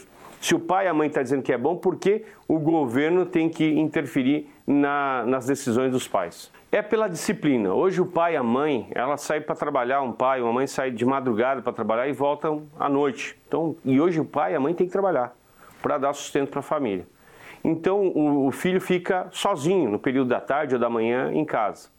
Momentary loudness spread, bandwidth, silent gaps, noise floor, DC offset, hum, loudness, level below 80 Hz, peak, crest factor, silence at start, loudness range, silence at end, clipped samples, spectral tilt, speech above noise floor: 5 LU; 17 kHz; none; -47 dBFS; under 0.1%; none; -24 LUFS; -66 dBFS; -8 dBFS; 16 dB; 0 s; 2 LU; 0.15 s; under 0.1%; -5.5 dB/octave; 24 dB